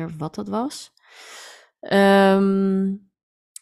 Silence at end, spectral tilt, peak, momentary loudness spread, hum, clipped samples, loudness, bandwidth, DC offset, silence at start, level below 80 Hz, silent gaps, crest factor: 0.65 s; -6.5 dB/octave; -6 dBFS; 25 LU; none; under 0.1%; -19 LUFS; 13 kHz; under 0.1%; 0 s; -62 dBFS; none; 14 dB